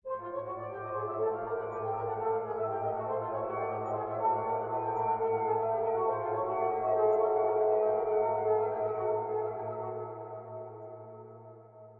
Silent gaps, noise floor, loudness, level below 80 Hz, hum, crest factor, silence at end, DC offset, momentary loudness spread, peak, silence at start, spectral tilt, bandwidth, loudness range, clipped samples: none; -52 dBFS; -32 LUFS; -68 dBFS; none; 14 dB; 0 s; under 0.1%; 15 LU; -18 dBFS; 0.05 s; -8 dB/octave; 3.3 kHz; 5 LU; under 0.1%